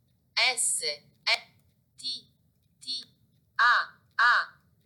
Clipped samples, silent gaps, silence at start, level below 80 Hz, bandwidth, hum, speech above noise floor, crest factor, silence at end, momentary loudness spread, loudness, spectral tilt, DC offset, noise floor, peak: under 0.1%; none; 0.35 s; -80 dBFS; 19 kHz; none; 42 dB; 18 dB; 0.35 s; 14 LU; -27 LUFS; 2.5 dB/octave; under 0.1%; -68 dBFS; -12 dBFS